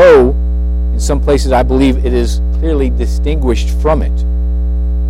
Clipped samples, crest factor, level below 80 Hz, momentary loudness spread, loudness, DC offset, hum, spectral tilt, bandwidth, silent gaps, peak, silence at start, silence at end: under 0.1%; 10 dB; -14 dBFS; 6 LU; -13 LUFS; under 0.1%; 60 Hz at -15 dBFS; -7 dB/octave; 11.5 kHz; none; 0 dBFS; 0 s; 0 s